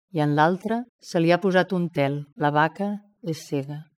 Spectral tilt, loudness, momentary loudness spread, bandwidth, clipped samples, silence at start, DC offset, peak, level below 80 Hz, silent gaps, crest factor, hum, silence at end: -7 dB/octave; -24 LUFS; 10 LU; 14 kHz; under 0.1%; 0.15 s; under 0.1%; -6 dBFS; -72 dBFS; 0.89-0.99 s; 18 dB; none; 0.15 s